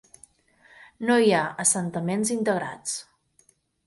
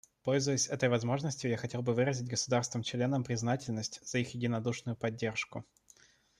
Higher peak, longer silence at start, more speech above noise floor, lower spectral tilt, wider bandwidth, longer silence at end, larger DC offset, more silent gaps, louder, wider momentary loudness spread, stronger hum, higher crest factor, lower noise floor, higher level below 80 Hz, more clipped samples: first, -6 dBFS vs -16 dBFS; first, 1 s vs 0.25 s; first, 40 dB vs 30 dB; about the same, -3.5 dB/octave vs -4.5 dB/octave; about the same, 12 kHz vs 12 kHz; about the same, 0.85 s vs 0.8 s; neither; neither; first, -24 LUFS vs -34 LUFS; first, 12 LU vs 7 LU; neither; about the same, 20 dB vs 18 dB; about the same, -64 dBFS vs -64 dBFS; about the same, -68 dBFS vs -70 dBFS; neither